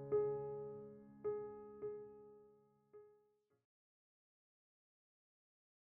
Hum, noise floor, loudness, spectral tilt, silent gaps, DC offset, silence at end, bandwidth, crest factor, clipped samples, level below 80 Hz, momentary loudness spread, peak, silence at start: none; -78 dBFS; -46 LUFS; -6 dB/octave; none; under 0.1%; 2.85 s; 2.6 kHz; 20 dB; under 0.1%; -82 dBFS; 24 LU; -30 dBFS; 0 s